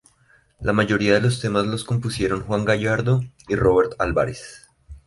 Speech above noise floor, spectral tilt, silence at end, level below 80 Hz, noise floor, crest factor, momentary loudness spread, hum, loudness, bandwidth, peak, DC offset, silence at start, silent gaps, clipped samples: 38 dB; -6 dB/octave; 0.1 s; -42 dBFS; -58 dBFS; 18 dB; 8 LU; none; -21 LUFS; 11.5 kHz; -4 dBFS; under 0.1%; 0.6 s; none; under 0.1%